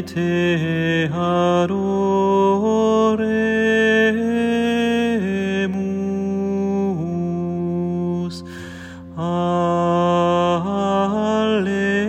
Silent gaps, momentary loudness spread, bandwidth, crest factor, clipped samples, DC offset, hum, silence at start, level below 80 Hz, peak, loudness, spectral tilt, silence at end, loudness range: none; 7 LU; 9 kHz; 14 dB; under 0.1%; under 0.1%; none; 0 s; -58 dBFS; -6 dBFS; -19 LUFS; -6.5 dB/octave; 0 s; 6 LU